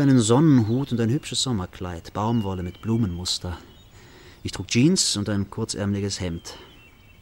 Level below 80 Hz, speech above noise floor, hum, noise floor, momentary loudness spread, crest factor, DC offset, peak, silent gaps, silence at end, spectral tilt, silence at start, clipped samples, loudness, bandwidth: -48 dBFS; 27 dB; none; -50 dBFS; 17 LU; 16 dB; under 0.1%; -8 dBFS; none; 0.55 s; -5 dB/octave; 0 s; under 0.1%; -23 LUFS; 16.5 kHz